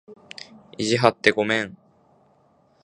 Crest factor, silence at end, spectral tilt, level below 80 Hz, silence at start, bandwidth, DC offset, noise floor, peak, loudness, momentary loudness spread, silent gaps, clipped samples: 26 dB; 1.1 s; -4.5 dB/octave; -62 dBFS; 0.1 s; 11 kHz; under 0.1%; -60 dBFS; 0 dBFS; -21 LUFS; 22 LU; none; under 0.1%